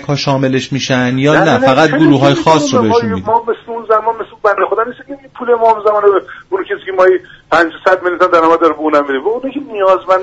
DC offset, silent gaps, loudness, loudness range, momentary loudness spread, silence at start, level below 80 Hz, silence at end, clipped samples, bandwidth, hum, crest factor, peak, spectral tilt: under 0.1%; none; -12 LUFS; 3 LU; 10 LU; 0 s; -50 dBFS; 0 s; under 0.1%; 8.2 kHz; none; 12 dB; 0 dBFS; -5.5 dB/octave